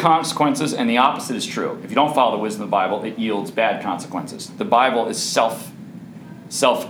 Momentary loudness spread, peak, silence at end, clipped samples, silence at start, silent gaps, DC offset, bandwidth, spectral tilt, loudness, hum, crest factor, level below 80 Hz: 15 LU; -2 dBFS; 0 s; under 0.1%; 0 s; none; under 0.1%; over 20 kHz; -4 dB/octave; -20 LUFS; none; 20 dB; -70 dBFS